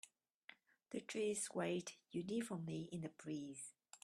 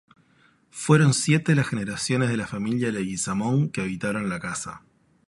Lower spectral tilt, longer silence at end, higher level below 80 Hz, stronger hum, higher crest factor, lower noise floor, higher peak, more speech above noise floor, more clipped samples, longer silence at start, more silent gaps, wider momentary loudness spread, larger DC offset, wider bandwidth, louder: about the same, -4.5 dB/octave vs -5.5 dB/octave; second, 0.05 s vs 0.5 s; second, -84 dBFS vs -56 dBFS; neither; about the same, 18 dB vs 20 dB; first, -67 dBFS vs -61 dBFS; second, -30 dBFS vs -4 dBFS; second, 21 dB vs 37 dB; neither; second, 0.05 s vs 0.75 s; first, 0.34-0.48 s vs none; first, 21 LU vs 12 LU; neither; first, 13 kHz vs 11.5 kHz; second, -46 LUFS vs -24 LUFS